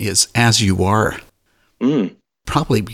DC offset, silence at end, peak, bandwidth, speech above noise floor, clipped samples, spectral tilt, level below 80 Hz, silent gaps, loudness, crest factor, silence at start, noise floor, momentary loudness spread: under 0.1%; 0 s; -2 dBFS; 16.5 kHz; 46 dB; under 0.1%; -4 dB/octave; -42 dBFS; none; -17 LUFS; 16 dB; 0 s; -62 dBFS; 12 LU